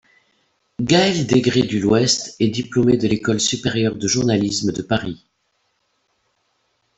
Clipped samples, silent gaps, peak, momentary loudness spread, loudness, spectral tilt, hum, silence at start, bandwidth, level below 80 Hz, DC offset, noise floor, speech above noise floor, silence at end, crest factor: under 0.1%; none; -2 dBFS; 7 LU; -18 LUFS; -4.5 dB/octave; none; 0.8 s; 8.4 kHz; -52 dBFS; under 0.1%; -68 dBFS; 50 dB; 1.8 s; 18 dB